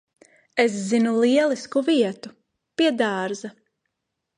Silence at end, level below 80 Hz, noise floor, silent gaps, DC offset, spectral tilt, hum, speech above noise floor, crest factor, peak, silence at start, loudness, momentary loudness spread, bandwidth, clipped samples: 0.9 s; -74 dBFS; -81 dBFS; none; under 0.1%; -4.5 dB/octave; none; 59 dB; 18 dB; -4 dBFS; 0.55 s; -22 LUFS; 16 LU; 10.5 kHz; under 0.1%